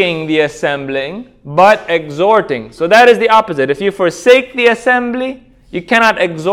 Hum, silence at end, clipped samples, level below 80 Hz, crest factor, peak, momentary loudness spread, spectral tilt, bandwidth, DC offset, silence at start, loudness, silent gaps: none; 0 s; 0.6%; -50 dBFS; 12 dB; 0 dBFS; 13 LU; -4.5 dB/octave; 15.5 kHz; under 0.1%; 0 s; -11 LUFS; none